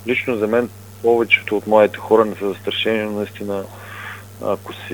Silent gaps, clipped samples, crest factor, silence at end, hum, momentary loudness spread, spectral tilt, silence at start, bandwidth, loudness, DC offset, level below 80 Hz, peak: none; under 0.1%; 20 dB; 0 s; none; 15 LU; -5.5 dB/octave; 0 s; over 20 kHz; -19 LUFS; 0.2%; -60 dBFS; 0 dBFS